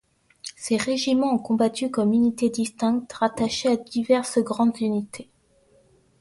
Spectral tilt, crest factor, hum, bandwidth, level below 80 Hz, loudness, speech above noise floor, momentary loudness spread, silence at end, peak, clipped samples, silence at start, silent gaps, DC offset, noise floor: -4.5 dB/octave; 18 dB; none; 11.5 kHz; -60 dBFS; -23 LUFS; 37 dB; 8 LU; 1 s; -6 dBFS; under 0.1%; 0.45 s; none; under 0.1%; -60 dBFS